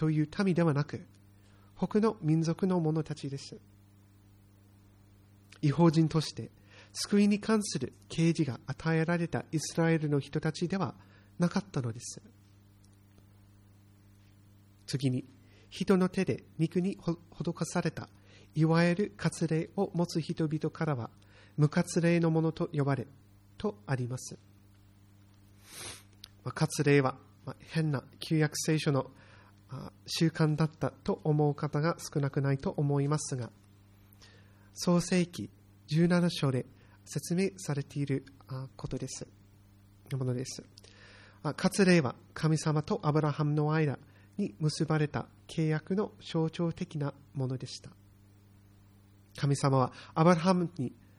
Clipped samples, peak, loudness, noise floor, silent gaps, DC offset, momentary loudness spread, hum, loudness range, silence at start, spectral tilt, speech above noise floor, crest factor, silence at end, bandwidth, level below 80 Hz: under 0.1%; -10 dBFS; -31 LUFS; -59 dBFS; none; under 0.1%; 16 LU; none; 8 LU; 0 s; -6.5 dB/octave; 29 dB; 22 dB; 0.25 s; 13 kHz; -62 dBFS